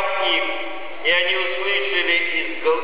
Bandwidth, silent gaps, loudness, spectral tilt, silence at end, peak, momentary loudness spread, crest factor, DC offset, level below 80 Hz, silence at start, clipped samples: 5.2 kHz; none; -19 LUFS; -7 dB/octave; 0 s; -8 dBFS; 7 LU; 14 dB; 4%; -70 dBFS; 0 s; under 0.1%